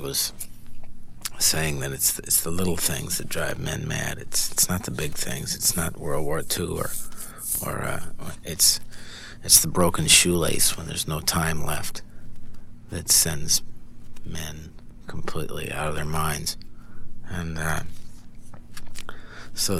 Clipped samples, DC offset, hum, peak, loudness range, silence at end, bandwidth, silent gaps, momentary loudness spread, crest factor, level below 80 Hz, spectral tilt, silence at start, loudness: under 0.1%; 0.2%; none; 0 dBFS; 12 LU; 0 s; 17 kHz; none; 21 LU; 24 dB; -40 dBFS; -2.5 dB/octave; 0 s; -23 LUFS